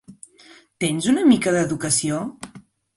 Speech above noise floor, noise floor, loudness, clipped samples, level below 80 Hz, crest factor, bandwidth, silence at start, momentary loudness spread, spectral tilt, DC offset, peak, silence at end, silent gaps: 31 dB; -50 dBFS; -20 LUFS; under 0.1%; -58 dBFS; 18 dB; 11.5 kHz; 0.1 s; 17 LU; -4 dB/octave; under 0.1%; -4 dBFS; 0.35 s; none